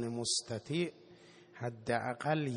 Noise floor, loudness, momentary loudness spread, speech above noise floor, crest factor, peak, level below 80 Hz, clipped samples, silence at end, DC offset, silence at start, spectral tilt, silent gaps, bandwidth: -59 dBFS; -36 LUFS; 10 LU; 23 dB; 18 dB; -18 dBFS; -72 dBFS; under 0.1%; 0 s; under 0.1%; 0 s; -4 dB/octave; none; 10.5 kHz